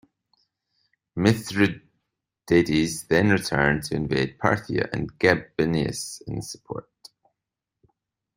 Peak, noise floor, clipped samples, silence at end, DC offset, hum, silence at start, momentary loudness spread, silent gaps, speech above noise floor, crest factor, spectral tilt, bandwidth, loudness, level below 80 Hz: -2 dBFS; -86 dBFS; under 0.1%; 1.55 s; under 0.1%; none; 1.15 s; 14 LU; none; 63 dB; 22 dB; -5.5 dB/octave; 16 kHz; -24 LUFS; -50 dBFS